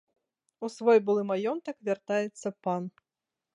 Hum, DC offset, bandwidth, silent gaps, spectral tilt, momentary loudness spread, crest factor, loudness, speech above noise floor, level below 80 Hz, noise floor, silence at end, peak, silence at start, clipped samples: none; under 0.1%; 10.5 kHz; none; -6 dB/octave; 14 LU; 18 dB; -29 LUFS; 61 dB; -82 dBFS; -89 dBFS; 0.65 s; -12 dBFS; 0.6 s; under 0.1%